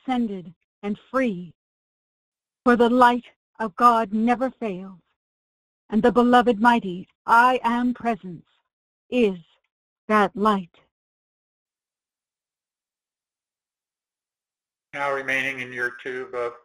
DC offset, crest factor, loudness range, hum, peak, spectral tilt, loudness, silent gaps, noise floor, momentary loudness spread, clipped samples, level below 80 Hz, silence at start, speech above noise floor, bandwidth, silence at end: under 0.1%; 20 dB; 9 LU; none; -4 dBFS; -6 dB/octave; -21 LUFS; 0.56-0.82 s, 1.55-2.32 s, 3.36-3.54 s, 5.16-5.89 s, 7.15-7.25 s, 8.73-9.10 s, 9.71-10.08 s, 10.91-11.66 s; under -90 dBFS; 16 LU; under 0.1%; -58 dBFS; 0.05 s; over 69 dB; 13.5 kHz; 0.1 s